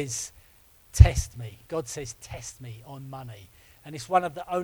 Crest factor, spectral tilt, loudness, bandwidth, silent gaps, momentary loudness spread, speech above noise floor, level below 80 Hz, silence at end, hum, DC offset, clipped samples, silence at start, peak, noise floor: 26 dB; -5.5 dB/octave; -25 LUFS; 20 kHz; none; 23 LU; 31 dB; -30 dBFS; 0 s; none; under 0.1%; under 0.1%; 0 s; 0 dBFS; -57 dBFS